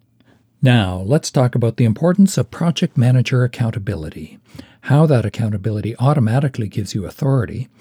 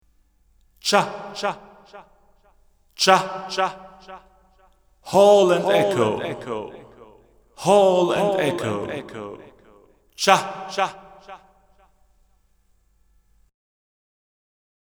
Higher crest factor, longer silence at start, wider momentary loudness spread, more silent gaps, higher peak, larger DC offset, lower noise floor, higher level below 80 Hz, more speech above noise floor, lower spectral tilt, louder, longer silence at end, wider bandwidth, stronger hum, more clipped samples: second, 14 dB vs 24 dB; second, 0.6 s vs 0.85 s; second, 11 LU vs 21 LU; neither; second, -4 dBFS vs 0 dBFS; neither; second, -55 dBFS vs -62 dBFS; first, -48 dBFS vs -60 dBFS; about the same, 38 dB vs 41 dB; first, -7 dB/octave vs -4 dB/octave; first, -17 LUFS vs -20 LUFS; second, 0.15 s vs 3.55 s; second, 14 kHz vs over 20 kHz; neither; neither